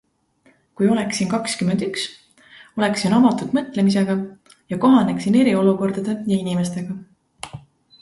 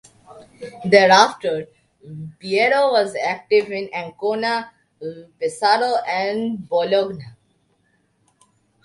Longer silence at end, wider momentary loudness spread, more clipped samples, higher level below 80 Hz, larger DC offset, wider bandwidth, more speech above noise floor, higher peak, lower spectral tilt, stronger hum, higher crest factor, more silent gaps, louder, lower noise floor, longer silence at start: second, 0.4 s vs 1.55 s; second, 16 LU vs 21 LU; neither; first, -58 dBFS vs -66 dBFS; neither; about the same, 11.5 kHz vs 11.5 kHz; second, 40 dB vs 45 dB; second, -4 dBFS vs 0 dBFS; first, -6 dB/octave vs -4 dB/octave; neither; about the same, 16 dB vs 20 dB; neither; about the same, -19 LUFS vs -19 LUFS; second, -59 dBFS vs -64 dBFS; first, 0.8 s vs 0.3 s